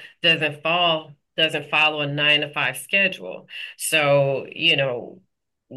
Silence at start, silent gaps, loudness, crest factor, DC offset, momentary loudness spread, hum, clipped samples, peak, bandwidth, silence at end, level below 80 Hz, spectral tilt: 0 s; none; -20 LUFS; 16 dB; under 0.1%; 14 LU; none; under 0.1%; -8 dBFS; 12.5 kHz; 0 s; -74 dBFS; -3 dB/octave